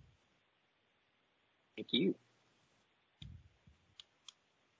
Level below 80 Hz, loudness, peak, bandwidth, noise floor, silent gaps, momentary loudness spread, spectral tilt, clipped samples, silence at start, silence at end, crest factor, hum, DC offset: -72 dBFS; -37 LUFS; -20 dBFS; 7.6 kHz; -78 dBFS; none; 25 LU; -4 dB/octave; under 0.1%; 1.75 s; 1.45 s; 26 dB; none; under 0.1%